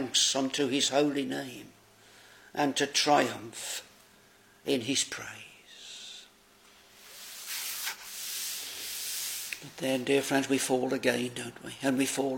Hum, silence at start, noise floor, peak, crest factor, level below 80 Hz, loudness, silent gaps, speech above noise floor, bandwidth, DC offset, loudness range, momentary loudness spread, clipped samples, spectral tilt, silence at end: none; 0 s; -60 dBFS; -10 dBFS; 22 dB; -76 dBFS; -30 LUFS; none; 30 dB; 17 kHz; under 0.1%; 8 LU; 17 LU; under 0.1%; -2.5 dB/octave; 0 s